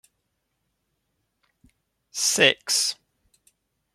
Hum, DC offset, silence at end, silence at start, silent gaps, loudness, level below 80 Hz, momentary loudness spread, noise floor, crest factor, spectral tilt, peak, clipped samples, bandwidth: none; under 0.1%; 1 s; 2.15 s; none; -20 LUFS; -72 dBFS; 17 LU; -77 dBFS; 26 dB; -0.5 dB/octave; -2 dBFS; under 0.1%; 15.5 kHz